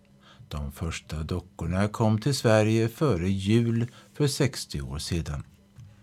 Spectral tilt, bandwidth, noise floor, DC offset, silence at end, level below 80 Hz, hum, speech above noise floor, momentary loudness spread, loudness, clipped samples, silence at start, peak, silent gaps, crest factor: -6 dB/octave; 15 kHz; -53 dBFS; under 0.1%; 0.15 s; -44 dBFS; none; 27 dB; 13 LU; -27 LUFS; under 0.1%; 0.4 s; -6 dBFS; none; 20 dB